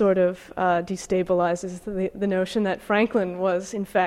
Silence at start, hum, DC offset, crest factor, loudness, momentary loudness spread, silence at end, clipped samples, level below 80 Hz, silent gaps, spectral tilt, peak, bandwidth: 0 s; none; under 0.1%; 14 dB; -24 LUFS; 6 LU; 0 s; under 0.1%; -54 dBFS; none; -6 dB/octave; -10 dBFS; 14 kHz